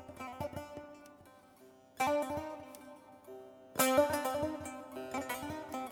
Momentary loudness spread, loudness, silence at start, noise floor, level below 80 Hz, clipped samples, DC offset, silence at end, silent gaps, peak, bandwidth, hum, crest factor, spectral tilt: 23 LU; -36 LUFS; 0 s; -60 dBFS; -66 dBFS; under 0.1%; under 0.1%; 0 s; none; -14 dBFS; over 20 kHz; none; 24 dB; -3.5 dB/octave